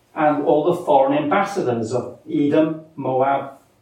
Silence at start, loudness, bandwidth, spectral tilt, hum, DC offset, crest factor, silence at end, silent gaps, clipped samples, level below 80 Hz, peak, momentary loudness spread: 0.15 s; -19 LUFS; 12 kHz; -7 dB/octave; none; under 0.1%; 16 dB; 0.25 s; none; under 0.1%; -68 dBFS; -4 dBFS; 9 LU